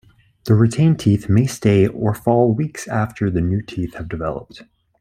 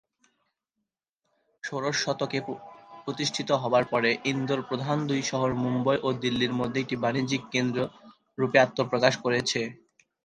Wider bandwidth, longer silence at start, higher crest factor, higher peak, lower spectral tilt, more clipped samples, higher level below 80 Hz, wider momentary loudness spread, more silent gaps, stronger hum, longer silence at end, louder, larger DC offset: first, 14.5 kHz vs 10 kHz; second, 0.45 s vs 1.65 s; second, 16 dB vs 24 dB; about the same, -2 dBFS vs -4 dBFS; first, -7.5 dB/octave vs -4.5 dB/octave; neither; first, -46 dBFS vs -64 dBFS; about the same, 11 LU vs 12 LU; neither; neither; about the same, 0.4 s vs 0.5 s; first, -18 LUFS vs -27 LUFS; neither